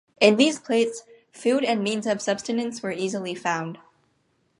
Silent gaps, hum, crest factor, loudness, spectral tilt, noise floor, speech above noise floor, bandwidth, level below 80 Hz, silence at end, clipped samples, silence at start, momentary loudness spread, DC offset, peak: none; none; 22 dB; -24 LUFS; -4 dB/octave; -68 dBFS; 45 dB; 11.5 kHz; -72 dBFS; 0.85 s; under 0.1%; 0.2 s; 10 LU; under 0.1%; -2 dBFS